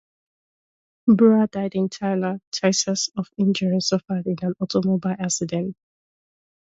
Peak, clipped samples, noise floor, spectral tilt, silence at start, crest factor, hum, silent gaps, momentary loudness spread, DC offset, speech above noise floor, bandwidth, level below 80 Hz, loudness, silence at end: -4 dBFS; under 0.1%; under -90 dBFS; -5 dB/octave; 1.05 s; 18 dB; none; 2.47-2.52 s; 10 LU; under 0.1%; over 69 dB; 8 kHz; -64 dBFS; -22 LUFS; 0.95 s